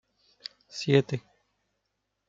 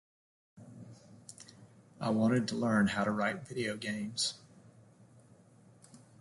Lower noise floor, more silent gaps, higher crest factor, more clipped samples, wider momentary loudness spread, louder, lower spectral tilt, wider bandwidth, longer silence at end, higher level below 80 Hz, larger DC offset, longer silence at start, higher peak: first, -80 dBFS vs -61 dBFS; neither; about the same, 24 dB vs 20 dB; neither; second, 19 LU vs 24 LU; first, -27 LUFS vs -33 LUFS; about the same, -6 dB/octave vs -5 dB/octave; second, 7.6 kHz vs 11.5 kHz; first, 1.1 s vs 0.25 s; about the same, -74 dBFS vs -70 dBFS; neither; first, 0.75 s vs 0.55 s; first, -8 dBFS vs -18 dBFS